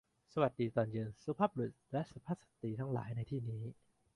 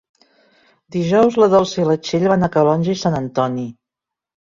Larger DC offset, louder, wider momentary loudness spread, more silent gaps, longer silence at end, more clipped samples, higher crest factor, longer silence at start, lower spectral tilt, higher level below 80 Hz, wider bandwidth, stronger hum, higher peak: neither; second, -40 LUFS vs -17 LUFS; about the same, 9 LU vs 10 LU; neither; second, 0.45 s vs 0.8 s; neither; first, 22 dB vs 16 dB; second, 0.35 s vs 0.9 s; first, -9 dB/octave vs -6.5 dB/octave; second, -70 dBFS vs -52 dBFS; first, 11 kHz vs 7.4 kHz; neither; second, -18 dBFS vs -2 dBFS